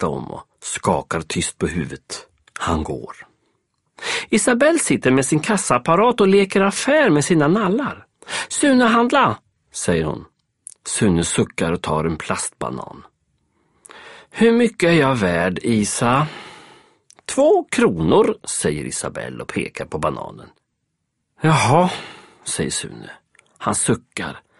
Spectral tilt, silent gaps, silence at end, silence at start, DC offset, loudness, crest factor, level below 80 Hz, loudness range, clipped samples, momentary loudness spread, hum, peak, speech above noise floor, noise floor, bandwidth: -4.5 dB/octave; none; 0.2 s; 0 s; under 0.1%; -18 LUFS; 18 dB; -46 dBFS; 8 LU; under 0.1%; 17 LU; none; -2 dBFS; 56 dB; -74 dBFS; 11.5 kHz